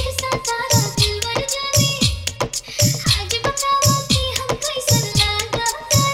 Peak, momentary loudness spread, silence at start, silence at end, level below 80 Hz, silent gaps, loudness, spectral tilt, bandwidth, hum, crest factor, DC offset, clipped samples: -2 dBFS; 6 LU; 0 s; 0 s; -34 dBFS; none; -18 LUFS; -3 dB/octave; 17 kHz; none; 18 dB; under 0.1%; under 0.1%